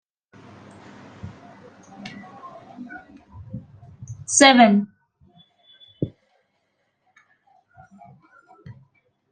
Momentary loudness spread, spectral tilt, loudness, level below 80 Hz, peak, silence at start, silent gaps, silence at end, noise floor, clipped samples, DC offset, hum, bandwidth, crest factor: 29 LU; -3 dB/octave; -16 LUFS; -62 dBFS; -2 dBFS; 1.25 s; none; 3.2 s; -72 dBFS; under 0.1%; under 0.1%; none; 9.6 kHz; 24 dB